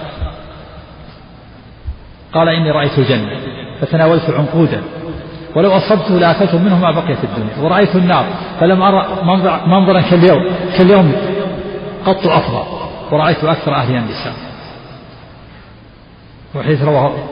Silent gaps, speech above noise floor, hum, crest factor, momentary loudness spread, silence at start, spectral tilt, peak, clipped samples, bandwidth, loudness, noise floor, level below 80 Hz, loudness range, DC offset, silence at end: none; 27 dB; none; 14 dB; 17 LU; 0 s; -5.5 dB/octave; 0 dBFS; under 0.1%; 5.4 kHz; -13 LUFS; -39 dBFS; -38 dBFS; 7 LU; under 0.1%; 0 s